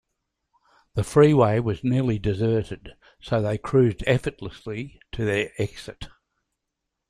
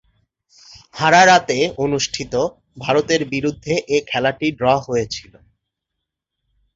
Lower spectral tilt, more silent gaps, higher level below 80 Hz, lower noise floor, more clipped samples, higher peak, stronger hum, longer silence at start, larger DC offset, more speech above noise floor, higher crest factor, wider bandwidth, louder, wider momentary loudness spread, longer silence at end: first, -7.5 dB/octave vs -4 dB/octave; neither; first, -46 dBFS vs -52 dBFS; about the same, -82 dBFS vs -80 dBFS; neither; second, -4 dBFS vs 0 dBFS; neither; first, 0.95 s vs 0.75 s; neither; second, 59 dB vs 63 dB; about the same, 20 dB vs 18 dB; first, 12 kHz vs 8 kHz; second, -23 LUFS vs -17 LUFS; first, 19 LU vs 12 LU; second, 1 s vs 1.55 s